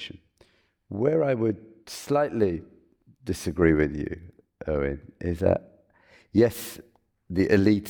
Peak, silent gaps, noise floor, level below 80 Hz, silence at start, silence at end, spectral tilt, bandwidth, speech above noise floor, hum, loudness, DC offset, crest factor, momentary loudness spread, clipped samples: -6 dBFS; none; -62 dBFS; -46 dBFS; 0 s; 0 s; -7 dB/octave; over 20 kHz; 38 dB; none; -26 LUFS; under 0.1%; 20 dB; 17 LU; under 0.1%